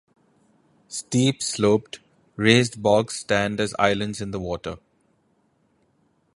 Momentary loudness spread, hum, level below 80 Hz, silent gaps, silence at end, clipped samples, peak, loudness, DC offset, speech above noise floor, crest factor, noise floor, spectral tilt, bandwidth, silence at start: 17 LU; none; -54 dBFS; none; 1.6 s; under 0.1%; -2 dBFS; -22 LUFS; under 0.1%; 44 dB; 22 dB; -66 dBFS; -4.5 dB/octave; 11.5 kHz; 0.9 s